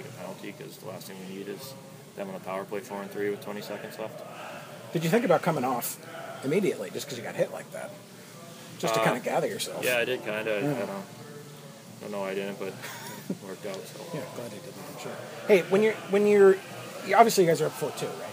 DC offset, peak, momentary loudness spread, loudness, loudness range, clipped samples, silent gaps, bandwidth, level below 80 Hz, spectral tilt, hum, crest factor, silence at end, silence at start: under 0.1%; -4 dBFS; 20 LU; -28 LUFS; 13 LU; under 0.1%; none; 15.5 kHz; -80 dBFS; -4.5 dB/octave; none; 24 dB; 0 s; 0 s